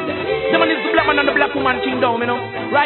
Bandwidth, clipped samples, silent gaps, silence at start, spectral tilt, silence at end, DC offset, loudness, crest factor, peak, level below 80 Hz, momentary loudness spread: 4.3 kHz; under 0.1%; none; 0 s; -10 dB/octave; 0 s; under 0.1%; -17 LUFS; 16 dB; 0 dBFS; -48 dBFS; 6 LU